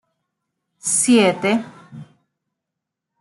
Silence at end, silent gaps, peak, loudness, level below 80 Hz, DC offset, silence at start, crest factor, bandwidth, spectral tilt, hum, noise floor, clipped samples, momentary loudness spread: 1.2 s; none; -4 dBFS; -17 LUFS; -70 dBFS; under 0.1%; 0.85 s; 18 dB; 12.5 kHz; -3 dB/octave; none; -82 dBFS; under 0.1%; 13 LU